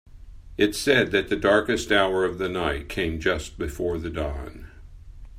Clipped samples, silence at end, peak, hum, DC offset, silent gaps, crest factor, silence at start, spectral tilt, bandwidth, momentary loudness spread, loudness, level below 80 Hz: under 0.1%; 0 s; -4 dBFS; none; under 0.1%; none; 22 dB; 0.15 s; -4.5 dB/octave; 16 kHz; 11 LU; -24 LUFS; -40 dBFS